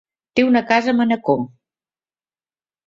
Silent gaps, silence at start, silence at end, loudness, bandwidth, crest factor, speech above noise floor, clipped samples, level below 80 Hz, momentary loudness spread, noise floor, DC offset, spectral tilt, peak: none; 0.35 s; 1.4 s; -18 LUFS; 7.2 kHz; 18 dB; over 73 dB; under 0.1%; -60 dBFS; 7 LU; under -90 dBFS; under 0.1%; -6 dB/octave; -2 dBFS